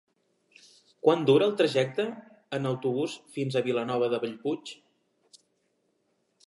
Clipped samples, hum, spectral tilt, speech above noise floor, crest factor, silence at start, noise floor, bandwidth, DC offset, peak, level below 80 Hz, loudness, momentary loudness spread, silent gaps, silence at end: under 0.1%; none; -6 dB/octave; 47 dB; 22 dB; 1.05 s; -74 dBFS; 11.5 kHz; under 0.1%; -8 dBFS; -82 dBFS; -28 LUFS; 12 LU; none; 1.75 s